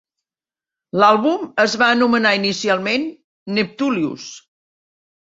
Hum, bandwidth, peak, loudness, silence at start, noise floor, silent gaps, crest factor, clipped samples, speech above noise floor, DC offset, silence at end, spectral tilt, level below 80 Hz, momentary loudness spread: none; 8 kHz; -2 dBFS; -17 LUFS; 0.95 s; under -90 dBFS; 3.24-3.46 s; 18 dB; under 0.1%; over 73 dB; under 0.1%; 0.8 s; -4 dB/octave; -64 dBFS; 13 LU